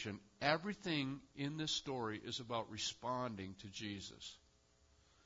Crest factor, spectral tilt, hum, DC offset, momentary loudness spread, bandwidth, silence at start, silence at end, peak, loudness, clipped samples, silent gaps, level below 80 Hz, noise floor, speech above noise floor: 26 dB; -3 dB/octave; none; under 0.1%; 11 LU; 7.4 kHz; 0 s; 0.9 s; -18 dBFS; -42 LUFS; under 0.1%; none; -72 dBFS; -72 dBFS; 29 dB